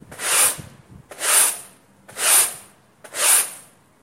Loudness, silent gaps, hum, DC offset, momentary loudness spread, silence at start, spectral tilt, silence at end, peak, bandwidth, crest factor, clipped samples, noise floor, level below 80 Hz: -17 LUFS; none; none; under 0.1%; 18 LU; 0.1 s; 1.5 dB/octave; 0.4 s; -2 dBFS; 16 kHz; 20 dB; under 0.1%; -48 dBFS; -62 dBFS